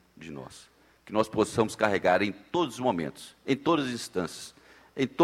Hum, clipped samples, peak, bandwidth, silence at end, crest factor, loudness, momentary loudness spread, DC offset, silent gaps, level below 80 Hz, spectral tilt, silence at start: none; under 0.1%; -8 dBFS; 15.5 kHz; 0 s; 22 dB; -28 LUFS; 18 LU; under 0.1%; none; -64 dBFS; -5 dB/octave; 0.2 s